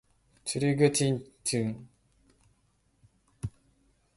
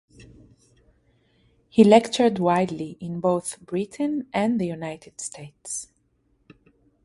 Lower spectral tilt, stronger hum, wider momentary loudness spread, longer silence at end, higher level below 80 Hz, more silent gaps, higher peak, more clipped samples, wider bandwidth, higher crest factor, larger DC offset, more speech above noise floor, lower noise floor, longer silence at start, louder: about the same, -5 dB/octave vs -5.5 dB/octave; neither; about the same, 17 LU vs 19 LU; second, 0.65 s vs 1.2 s; about the same, -60 dBFS vs -62 dBFS; neither; second, -10 dBFS vs -2 dBFS; neither; about the same, 12 kHz vs 11.5 kHz; about the same, 22 dB vs 22 dB; neither; about the same, 43 dB vs 44 dB; about the same, -70 dBFS vs -67 dBFS; second, 0.45 s vs 1.75 s; second, -30 LUFS vs -23 LUFS